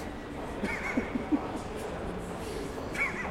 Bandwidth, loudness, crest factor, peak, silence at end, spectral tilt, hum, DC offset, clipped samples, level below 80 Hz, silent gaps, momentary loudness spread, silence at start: 16.5 kHz; -34 LUFS; 18 dB; -16 dBFS; 0 s; -5.5 dB/octave; none; under 0.1%; under 0.1%; -48 dBFS; none; 7 LU; 0 s